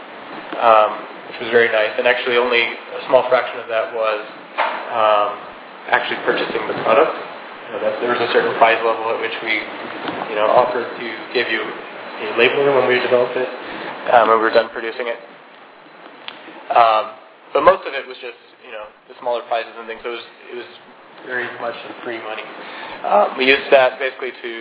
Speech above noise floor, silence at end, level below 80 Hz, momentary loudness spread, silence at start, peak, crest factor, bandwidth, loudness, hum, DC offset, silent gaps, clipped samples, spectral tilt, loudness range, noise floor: 24 dB; 0 s; -64 dBFS; 18 LU; 0 s; 0 dBFS; 18 dB; 4 kHz; -18 LUFS; none; under 0.1%; none; under 0.1%; -7 dB/octave; 10 LU; -42 dBFS